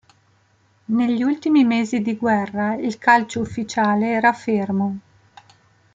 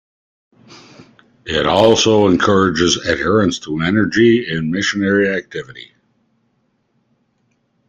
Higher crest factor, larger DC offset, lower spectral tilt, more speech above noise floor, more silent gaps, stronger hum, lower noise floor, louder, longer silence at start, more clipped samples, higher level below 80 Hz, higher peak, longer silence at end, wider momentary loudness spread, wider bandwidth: about the same, 18 dB vs 16 dB; neither; first, -6 dB/octave vs -4.5 dB/octave; second, 41 dB vs 49 dB; neither; neither; second, -60 dBFS vs -64 dBFS; second, -20 LUFS vs -14 LUFS; first, 0.9 s vs 0.7 s; neither; second, -60 dBFS vs -48 dBFS; about the same, -2 dBFS vs 0 dBFS; second, 0.95 s vs 2.05 s; second, 8 LU vs 14 LU; second, 7.8 kHz vs 9.2 kHz